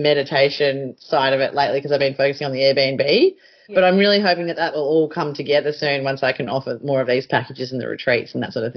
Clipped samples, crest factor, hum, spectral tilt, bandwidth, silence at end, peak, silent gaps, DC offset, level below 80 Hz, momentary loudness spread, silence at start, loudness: under 0.1%; 16 dB; none; -3 dB/octave; 6.4 kHz; 0.05 s; -4 dBFS; none; under 0.1%; -64 dBFS; 8 LU; 0 s; -19 LUFS